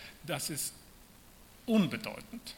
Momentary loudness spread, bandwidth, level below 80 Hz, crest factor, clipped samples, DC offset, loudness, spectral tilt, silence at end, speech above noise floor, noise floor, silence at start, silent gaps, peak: 16 LU; 17.5 kHz; -62 dBFS; 18 dB; under 0.1%; under 0.1%; -34 LUFS; -4.5 dB/octave; 0 s; 23 dB; -57 dBFS; 0 s; none; -18 dBFS